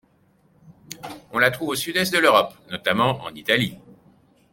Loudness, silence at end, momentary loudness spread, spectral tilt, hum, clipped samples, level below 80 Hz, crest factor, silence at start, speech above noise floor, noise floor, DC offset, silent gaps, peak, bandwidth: -21 LUFS; 0.8 s; 20 LU; -4 dB/octave; none; under 0.1%; -60 dBFS; 22 dB; 0.7 s; 39 dB; -60 dBFS; under 0.1%; none; -2 dBFS; 17 kHz